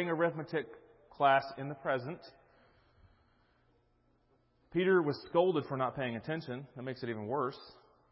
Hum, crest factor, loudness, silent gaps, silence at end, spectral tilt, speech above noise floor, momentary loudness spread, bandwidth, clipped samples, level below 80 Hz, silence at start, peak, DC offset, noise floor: none; 20 dB; -34 LUFS; none; 0.4 s; -4.5 dB/octave; 38 dB; 15 LU; 5.6 kHz; under 0.1%; -72 dBFS; 0 s; -14 dBFS; under 0.1%; -72 dBFS